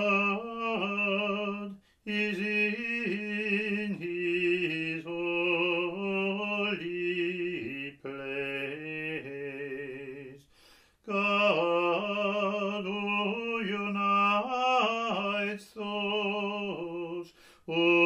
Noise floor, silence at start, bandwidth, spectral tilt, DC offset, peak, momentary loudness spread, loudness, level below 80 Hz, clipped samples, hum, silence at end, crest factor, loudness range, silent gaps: -61 dBFS; 0 s; 10.5 kHz; -5.5 dB/octave; under 0.1%; -12 dBFS; 12 LU; -30 LUFS; -72 dBFS; under 0.1%; none; 0 s; 18 dB; 6 LU; none